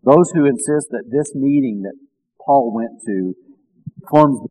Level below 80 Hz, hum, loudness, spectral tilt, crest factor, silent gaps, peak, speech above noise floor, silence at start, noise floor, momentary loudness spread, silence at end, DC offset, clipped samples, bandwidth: -64 dBFS; none; -17 LUFS; -7 dB/octave; 16 dB; none; 0 dBFS; 23 dB; 0.05 s; -38 dBFS; 17 LU; 0.05 s; under 0.1%; 0.1%; 13 kHz